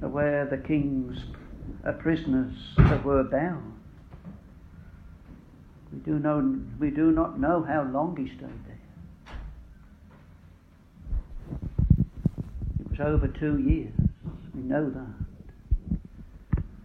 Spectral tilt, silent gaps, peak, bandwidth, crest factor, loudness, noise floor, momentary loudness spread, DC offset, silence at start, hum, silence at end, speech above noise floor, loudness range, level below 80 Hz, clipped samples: -10 dB/octave; none; -4 dBFS; 6.2 kHz; 24 dB; -28 LUFS; -54 dBFS; 22 LU; under 0.1%; 0 s; none; 0 s; 28 dB; 8 LU; -36 dBFS; under 0.1%